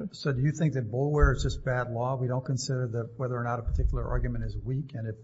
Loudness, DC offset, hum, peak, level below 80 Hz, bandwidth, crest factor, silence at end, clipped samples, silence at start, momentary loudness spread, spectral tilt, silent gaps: -30 LUFS; under 0.1%; none; -10 dBFS; -34 dBFS; 8 kHz; 18 dB; 0 s; under 0.1%; 0 s; 8 LU; -6.5 dB/octave; none